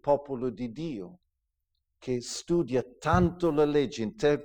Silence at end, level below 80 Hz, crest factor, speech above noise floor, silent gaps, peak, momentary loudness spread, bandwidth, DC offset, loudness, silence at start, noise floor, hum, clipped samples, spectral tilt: 0 s; -48 dBFS; 20 dB; 53 dB; none; -8 dBFS; 12 LU; 18 kHz; under 0.1%; -29 LUFS; 0.05 s; -81 dBFS; none; under 0.1%; -6 dB/octave